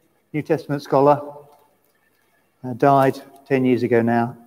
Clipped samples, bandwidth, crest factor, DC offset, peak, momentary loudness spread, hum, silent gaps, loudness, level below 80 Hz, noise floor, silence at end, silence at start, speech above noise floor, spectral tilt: under 0.1%; 16 kHz; 18 dB; under 0.1%; -2 dBFS; 17 LU; none; none; -19 LUFS; -68 dBFS; -63 dBFS; 0.15 s; 0.35 s; 45 dB; -8 dB/octave